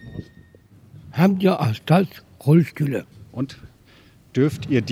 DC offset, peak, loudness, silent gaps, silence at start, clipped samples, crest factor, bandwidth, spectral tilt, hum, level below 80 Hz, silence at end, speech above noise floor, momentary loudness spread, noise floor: under 0.1%; -2 dBFS; -21 LUFS; none; 0.05 s; under 0.1%; 20 dB; 15.5 kHz; -8 dB/octave; none; -56 dBFS; 0 s; 32 dB; 14 LU; -51 dBFS